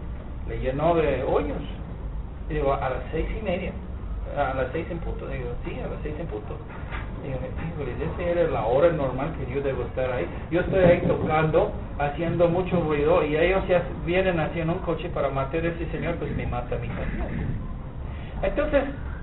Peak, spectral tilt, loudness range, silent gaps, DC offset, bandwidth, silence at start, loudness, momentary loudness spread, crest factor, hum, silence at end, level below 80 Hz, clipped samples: -4 dBFS; -6 dB/octave; 8 LU; none; 0.2%; 4.1 kHz; 0 s; -26 LUFS; 13 LU; 20 dB; none; 0 s; -34 dBFS; under 0.1%